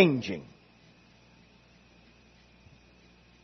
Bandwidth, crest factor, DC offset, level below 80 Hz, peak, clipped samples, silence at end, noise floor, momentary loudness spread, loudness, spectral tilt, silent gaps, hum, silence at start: 6.2 kHz; 28 dB; under 0.1%; -66 dBFS; -6 dBFS; under 0.1%; 3 s; -59 dBFS; 27 LU; -30 LUFS; -5 dB/octave; none; 60 Hz at -65 dBFS; 0 s